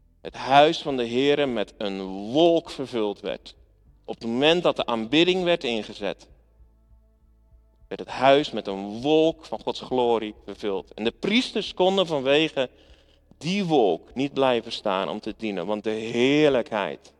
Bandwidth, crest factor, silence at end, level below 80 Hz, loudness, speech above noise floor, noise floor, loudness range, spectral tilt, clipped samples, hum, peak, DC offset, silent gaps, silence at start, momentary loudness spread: 11 kHz; 22 dB; 0.25 s; -56 dBFS; -24 LUFS; 35 dB; -58 dBFS; 3 LU; -5 dB/octave; under 0.1%; none; -2 dBFS; under 0.1%; none; 0.25 s; 13 LU